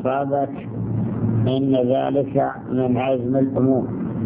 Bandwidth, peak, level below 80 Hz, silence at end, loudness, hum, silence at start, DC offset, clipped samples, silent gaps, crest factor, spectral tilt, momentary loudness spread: 3.8 kHz; -6 dBFS; -48 dBFS; 0 s; -21 LUFS; none; 0 s; under 0.1%; under 0.1%; none; 14 dB; -12.5 dB/octave; 6 LU